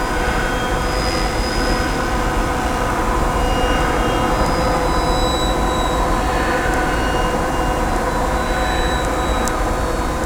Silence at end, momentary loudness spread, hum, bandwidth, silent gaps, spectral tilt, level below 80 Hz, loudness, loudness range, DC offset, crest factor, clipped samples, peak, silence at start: 0 s; 2 LU; none; 20 kHz; none; -4.5 dB/octave; -22 dBFS; -19 LUFS; 1 LU; under 0.1%; 18 dB; under 0.1%; 0 dBFS; 0 s